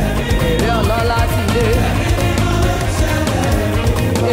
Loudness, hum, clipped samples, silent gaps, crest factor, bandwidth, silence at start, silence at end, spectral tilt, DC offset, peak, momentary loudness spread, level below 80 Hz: -16 LUFS; none; under 0.1%; none; 8 dB; 16.5 kHz; 0 s; 0 s; -5.5 dB/octave; under 0.1%; -6 dBFS; 2 LU; -20 dBFS